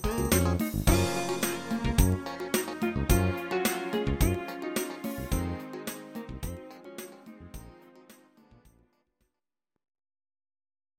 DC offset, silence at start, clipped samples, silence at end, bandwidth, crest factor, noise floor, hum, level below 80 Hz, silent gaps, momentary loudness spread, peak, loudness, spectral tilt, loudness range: under 0.1%; 0 s; under 0.1%; 2.85 s; 17 kHz; 24 dB; -87 dBFS; none; -38 dBFS; none; 18 LU; -8 dBFS; -30 LUFS; -5 dB/octave; 18 LU